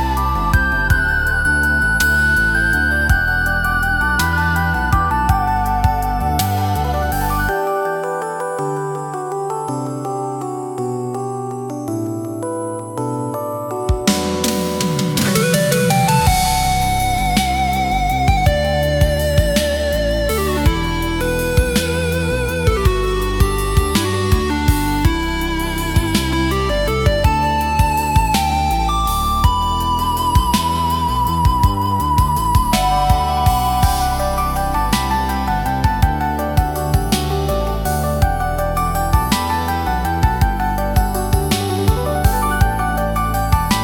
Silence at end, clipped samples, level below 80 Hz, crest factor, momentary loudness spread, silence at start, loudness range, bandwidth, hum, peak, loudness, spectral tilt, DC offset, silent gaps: 0 s; under 0.1%; -22 dBFS; 16 dB; 8 LU; 0 s; 6 LU; 17.5 kHz; none; 0 dBFS; -17 LUFS; -5 dB/octave; under 0.1%; none